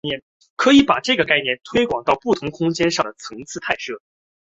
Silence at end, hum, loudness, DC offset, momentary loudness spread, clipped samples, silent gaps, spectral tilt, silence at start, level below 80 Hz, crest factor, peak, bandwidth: 0.5 s; none; -18 LUFS; under 0.1%; 17 LU; under 0.1%; 0.22-0.40 s, 0.50-0.57 s; -4 dB/octave; 0.05 s; -52 dBFS; 18 dB; -2 dBFS; 8 kHz